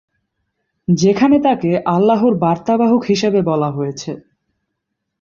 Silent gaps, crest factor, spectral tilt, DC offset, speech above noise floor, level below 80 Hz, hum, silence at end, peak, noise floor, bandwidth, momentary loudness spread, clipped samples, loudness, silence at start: none; 14 dB; -7 dB/octave; under 0.1%; 61 dB; -54 dBFS; none; 1.05 s; -2 dBFS; -75 dBFS; 7.4 kHz; 13 LU; under 0.1%; -15 LUFS; 0.9 s